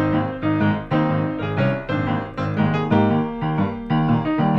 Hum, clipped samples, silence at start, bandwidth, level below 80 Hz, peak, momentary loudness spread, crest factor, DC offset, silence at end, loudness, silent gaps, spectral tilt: none; under 0.1%; 0 s; 6 kHz; -44 dBFS; -6 dBFS; 5 LU; 14 dB; under 0.1%; 0 s; -21 LUFS; none; -9.5 dB/octave